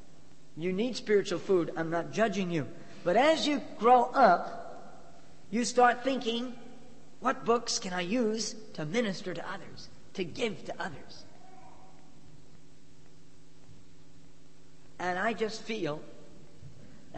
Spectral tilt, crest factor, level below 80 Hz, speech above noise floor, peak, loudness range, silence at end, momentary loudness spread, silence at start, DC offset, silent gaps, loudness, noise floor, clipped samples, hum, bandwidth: -4 dB/octave; 22 dB; -66 dBFS; 30 dB; -10 dBFS; 14 LU; 0 s; 19 LU; 0.55 s; 0.8%; none; -30 LUFS; -59 dBFS; under 0.1%; none; 8.8 kHz